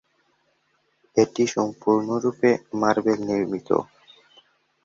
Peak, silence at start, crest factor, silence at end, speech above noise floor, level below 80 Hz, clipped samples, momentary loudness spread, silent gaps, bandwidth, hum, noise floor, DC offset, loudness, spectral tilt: -6 dBFS; 1.15 s; 20 dB; 1 s; 46 dB; -64 dBFS; under 0.1%; 5 LU; none; 7.8 kHz; none; -68 dBFS; under 0.1%; -23 LUFS; -5.5 dB/octave